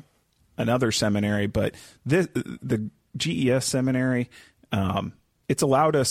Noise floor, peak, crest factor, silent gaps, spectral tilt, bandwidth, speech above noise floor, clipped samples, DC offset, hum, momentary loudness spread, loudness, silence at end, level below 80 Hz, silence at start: -64 dBFS; -8 dBFS; 16 dB; none; -5 dB/octave; 16 kHz; 41 dB; under 0.1%; under 0.1%; none; 12 LU; -25 LUFS; 0 s; -52 dBFS; 0.6 s